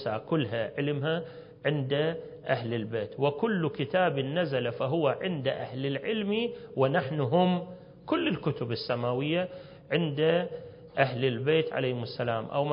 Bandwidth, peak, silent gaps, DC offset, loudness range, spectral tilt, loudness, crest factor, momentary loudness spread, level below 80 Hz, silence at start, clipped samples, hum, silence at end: 5.4 kHz; -8 dBFS; none; under 0.1%; 1 LU; -10.5 dB/octave; -29 LUFS; 20 dB; 7 LU; -66 dBFS; 0 s; under 0.1%; none; 0 s